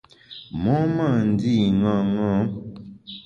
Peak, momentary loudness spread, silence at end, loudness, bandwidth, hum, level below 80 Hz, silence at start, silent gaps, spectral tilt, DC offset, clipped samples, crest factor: -8 dBFS; 19 LU; 0.05 s; -21 LUFS; 7 kHz; none; -48 dBFS; 0.3 s; none; -8.5 dB/octave; under 0.1%; under 0.1%; 14 dB